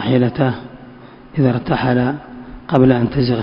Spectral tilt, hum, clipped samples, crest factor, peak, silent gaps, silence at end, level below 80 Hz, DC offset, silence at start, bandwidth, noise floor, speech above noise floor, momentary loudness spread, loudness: -10.5 dB/octave; none; under 0.1%; 16 dB; 0 dBFS; none; 0 s; -42 dBFS; under 0.1%; 0 s; 5.4 kHz; -39 dBFS; 24 dB; 17 LU; -16 LUFS